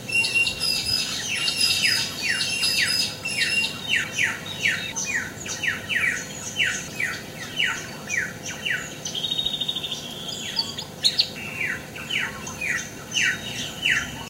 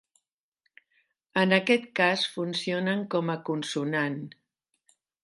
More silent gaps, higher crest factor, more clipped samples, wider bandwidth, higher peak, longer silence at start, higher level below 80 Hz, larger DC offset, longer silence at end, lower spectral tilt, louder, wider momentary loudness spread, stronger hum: neither; about the same, 22 dB vs 22 dB; neither; first, 16.5 kHz vs 11.5 kHz; about the same, -4 dBFS vs -6 dBFS; second, 0 s vs 1.35 s; first, -54 dBFS vs -78 dBFS; neither; second, 0 s vs 0.95 s; second, -1 dB/octave vs -5 dB/octave; first, -23 LUFS vs -27 LUFS; about the same, 10 LU vs 9 LU; neither